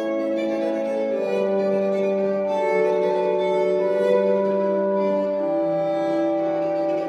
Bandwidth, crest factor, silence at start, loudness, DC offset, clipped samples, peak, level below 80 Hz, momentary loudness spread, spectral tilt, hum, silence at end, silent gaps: 8.4 kHz; 12 dB; 0 s; -22 LUFS; under 0.1%; under 0.1%; -8 dBFS; -70 dBFS; 4 LU; -7.5 dB/octave; none; 0 s; none